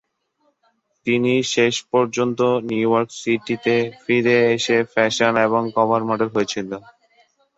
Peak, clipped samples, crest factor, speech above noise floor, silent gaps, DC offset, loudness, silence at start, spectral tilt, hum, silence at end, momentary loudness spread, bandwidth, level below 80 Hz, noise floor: -2 dBFS; under 0.1%; 18 dB; 48 dB; none; under 0.1%; -19 LUFS; 1.05 s; -4.5 dB/octave; none; 0.8 s; 6 LU; 8 kHz; -62 dBFS; -67 dBFS